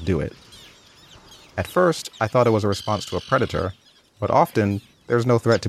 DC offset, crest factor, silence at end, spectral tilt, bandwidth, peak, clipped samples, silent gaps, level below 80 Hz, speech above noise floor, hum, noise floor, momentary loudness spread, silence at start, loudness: under 0.1%; 18 dB; 0 s; -6 dB/octave; 15.5 kHz; -4 dBFS; under 0.1%; none; -48 dBFS; 28 dB; none; -49 dBFS; 12 LU; 0 s; -22 LUFS